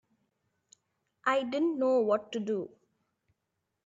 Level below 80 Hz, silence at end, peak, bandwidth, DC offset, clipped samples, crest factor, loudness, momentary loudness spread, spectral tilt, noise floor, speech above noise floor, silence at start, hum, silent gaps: -84 dBFS; 1.2 s; -14 dBFS; 8 kHz; under 0.1%; under 0.1%; 20 dB; -30 LUFS; 8 LU; -5.5 dB/octave; -84 dBFS; 54 dB; 1.25 s; none; none